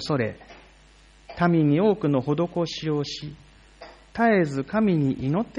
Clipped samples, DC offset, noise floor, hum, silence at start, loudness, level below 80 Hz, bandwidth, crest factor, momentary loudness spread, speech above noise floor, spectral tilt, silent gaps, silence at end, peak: under 0.1%; under 0.1%; -53 dBFS; none; 0 s; -23 LUFS; -54 dBFS; 10 kHz; 16 dB; 15 LU; 30 dB; -7 dB/octave; none; 0 s; -8 dBFS